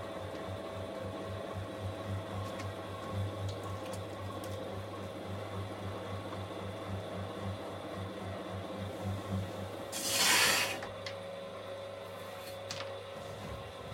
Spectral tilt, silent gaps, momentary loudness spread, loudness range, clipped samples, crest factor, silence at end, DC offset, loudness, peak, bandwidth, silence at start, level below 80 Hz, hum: -3 dB/octave; none; 12 LU; 9 LU; under 0.1%; 24 dB; 0 s; under 0.1%; -37 LUFS; -14 dBFS; 16.5 kHz; 0 s; -64 dBFS; none